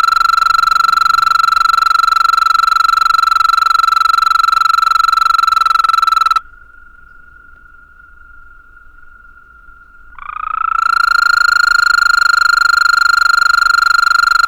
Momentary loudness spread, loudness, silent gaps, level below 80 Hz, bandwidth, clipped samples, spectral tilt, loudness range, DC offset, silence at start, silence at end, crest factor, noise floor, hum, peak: 2 LU; -10 LUFS; none; -42 dBFS; over 20 kHz; under 0.1%; 2 dB/octave; 9 LU; under 0.1%; 0 s; 0 s; 8 dB; -40 dBFS; none; -4 dBFS